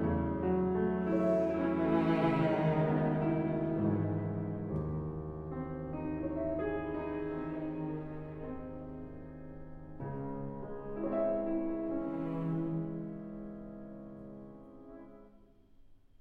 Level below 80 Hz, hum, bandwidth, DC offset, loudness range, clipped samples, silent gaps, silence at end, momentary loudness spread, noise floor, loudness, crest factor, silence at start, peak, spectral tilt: -54 dBFS; none; 5 kHz; under 0.1%; 12 LU; under 0.1%; none; 0.25 s; 18 LU; -60 dBFS; -35 LUFS; 16 dB; 0 s; -18 dBFS; -10 dB/octave